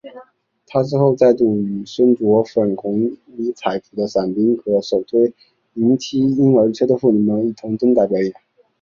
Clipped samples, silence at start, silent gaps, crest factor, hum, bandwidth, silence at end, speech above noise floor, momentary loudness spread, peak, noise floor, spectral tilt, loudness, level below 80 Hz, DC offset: under 0.1%; 0.05 s; none; 14 dB; none; 7.4 kHz; 0.5 s; 35 dB; 9 LU; -2 dBFS; -51 dBFS; -8 dB/octave; -17 LUFS; -58 dBFS; under 0.1%